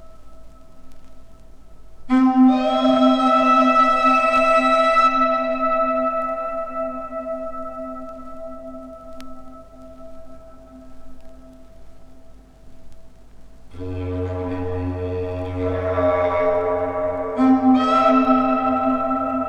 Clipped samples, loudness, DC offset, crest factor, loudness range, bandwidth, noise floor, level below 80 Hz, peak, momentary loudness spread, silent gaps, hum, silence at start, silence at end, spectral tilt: under 0.1%; -18 LUFS; under 0.1%; 16 dB; 20 LU; 9 kHz; -42 dBFS; -46 dBFS; -4 dBFS; 20 LU; none; none; 0 s; 0 s; -6.5 dB/octave